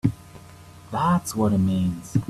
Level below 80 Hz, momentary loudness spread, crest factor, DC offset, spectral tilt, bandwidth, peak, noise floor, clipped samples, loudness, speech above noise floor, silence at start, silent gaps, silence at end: -50 dBFS; 9 LU; 18 dB; under 0.1%; -7 dB/octave; 13.5 kHz; -6 dBFS; -45 dBFS; under 0.1%; -23 LUFS; 23 dB; 0.05 s; none; 0 s